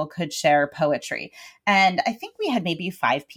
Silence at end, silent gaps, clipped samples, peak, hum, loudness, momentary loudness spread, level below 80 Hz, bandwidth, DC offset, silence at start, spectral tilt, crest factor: 0.05 s; none; under 0.1%; -6 dBFS; none; -23 LUFS; 11 LU; -66 dBFS; 18 kHz; under 0.1%; 0 s; -4 dB/octave; 16 dB